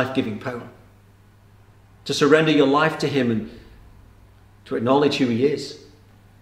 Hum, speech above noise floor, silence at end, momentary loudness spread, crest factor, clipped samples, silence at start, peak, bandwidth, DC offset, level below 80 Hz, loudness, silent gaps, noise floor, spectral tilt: 50 Hz at -55 dBFS; 32 dB; 0.65 s; 19 LU; 20 dB; under 0.1%; 0 s; -2 dBFS; 13.5 kHz; under 0.1%; -54 dBFS; -20 LUFS; none; -51 dBFS; -5.5 dB/octave